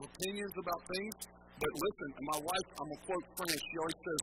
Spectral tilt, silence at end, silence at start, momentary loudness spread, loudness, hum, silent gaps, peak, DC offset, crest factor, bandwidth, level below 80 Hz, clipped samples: -3 dB/octave; 0 s; 0 s; 8 LU; -39 LUFS; none; none; -16 dBFS; under 0.1%; 24 dB; 16.5 kHz; -64 dBFS; under 0.1%